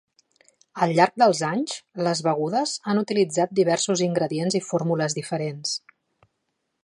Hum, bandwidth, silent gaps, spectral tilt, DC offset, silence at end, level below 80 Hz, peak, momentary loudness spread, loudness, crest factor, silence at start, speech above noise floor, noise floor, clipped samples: none; 11.5 kHz; none; -4.5 dB/octave; under 0.1%; 1.05 s; -74 dBFS; -2 dBFS; 9 LU; -23 LUFS; 22 dB; 0.75 s; 54 dB; -77 dBFS; under 0.1%